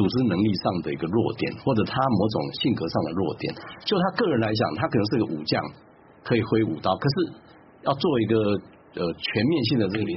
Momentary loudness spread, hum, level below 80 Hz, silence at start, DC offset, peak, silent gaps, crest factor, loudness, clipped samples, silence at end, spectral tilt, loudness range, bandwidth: 8 LU; none; -56 dBFS; 0 s; under 0.1%; -8 dBFS; none; 16 dB; -25 LUFS; under 0.1%; 0 s; -5 dB/octave; 1 LU; 6 kHz